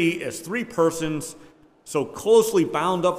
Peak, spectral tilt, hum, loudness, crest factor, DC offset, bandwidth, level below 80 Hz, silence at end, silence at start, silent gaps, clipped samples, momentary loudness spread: -6 dBFS; -5 dB/octave; none; -23 LUFS; 16 dB; under 0.1%; 16 kHz; -58 dBFS; 0 s; 0 s; none; under 0.1%; 12 LU